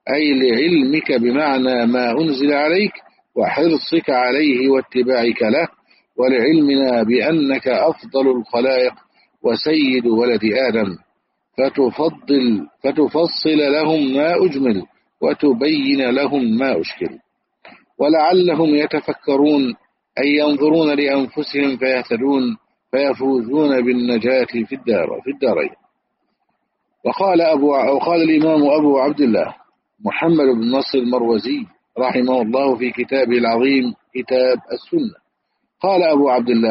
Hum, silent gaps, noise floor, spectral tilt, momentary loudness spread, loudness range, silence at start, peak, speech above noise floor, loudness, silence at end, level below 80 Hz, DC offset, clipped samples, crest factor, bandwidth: none; none; -72 dBFS; -3.5 dB/octave; 8 LU; 3 LU; 0.05 s; -4 dBFS; 56 dB; -17 LUFS; 0 s; -62 dBFS; under 0.1%; under 0.1%; 12 dB; 5.8 kHz